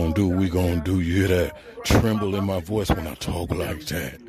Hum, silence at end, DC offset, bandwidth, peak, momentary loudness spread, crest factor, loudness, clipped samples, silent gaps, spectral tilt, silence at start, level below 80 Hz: none; 0 s; under 0.1%; 14.5 kHz; -6 dBFS; 8 LU; 16 dB; -24 LUFS; under 0.1%; none; -6 dB/octave; 0 s; -36 dBFS